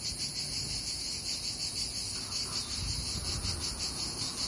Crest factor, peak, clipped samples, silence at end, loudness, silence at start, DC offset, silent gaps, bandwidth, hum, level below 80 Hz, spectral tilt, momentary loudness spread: 14 dB; -20 dBFS; under 0.1%; 0 s; -33 LUFS; 0 s; under 0.1%; none; 11.5 kHz; none; -48 dBFS; -1.5 dB/octave; 1 LU